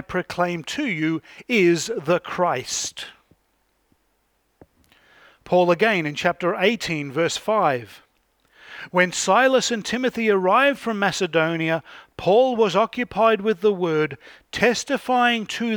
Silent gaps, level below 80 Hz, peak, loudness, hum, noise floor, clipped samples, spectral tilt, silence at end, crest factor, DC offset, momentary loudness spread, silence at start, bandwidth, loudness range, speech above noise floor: none; -60 dBFS; -4 dBFS; -21 LUFS; none; -68 dBFS; under 0.1%; -4 dB/octave; 0 s; 18 dB; under 0.1%; 10 LU; 0.1 s; 19.5 kHz; 5 LU; 47 dB